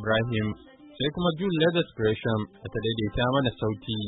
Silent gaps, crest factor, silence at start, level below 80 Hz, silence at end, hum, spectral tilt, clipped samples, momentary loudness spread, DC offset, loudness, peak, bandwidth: none; 16 dB; 0 s; -48 dBFS; 0 s; none; -10.5 dB/octave; under 0.1%; 7 LU; under 0.1%; -27 LUFS; -10 dBFS; 4.1 kHz